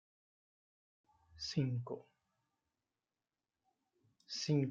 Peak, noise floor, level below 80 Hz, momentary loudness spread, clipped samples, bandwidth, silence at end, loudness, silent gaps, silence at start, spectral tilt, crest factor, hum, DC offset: -24 dBFS; under -90 dBFS; -76 dBFS; 12 LU; under 0.1%; 7.6 kHz; 0 s; -40 LUFS; none; 1.35 s; -6 dB/octave; 20 dB; none; under 0.1%